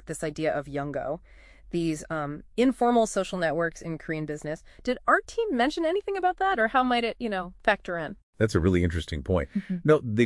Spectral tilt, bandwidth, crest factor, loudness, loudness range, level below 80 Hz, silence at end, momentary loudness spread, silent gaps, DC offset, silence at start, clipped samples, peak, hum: -6 dB/octave; 12 kHz; 20 dB; -27 LUFS; 2 LU; -48 dBFS; 0 s; 10 LU; 8.23-8.33 s; under 0.1%; 0.05 s; under 0.1%; -6 dBFS; none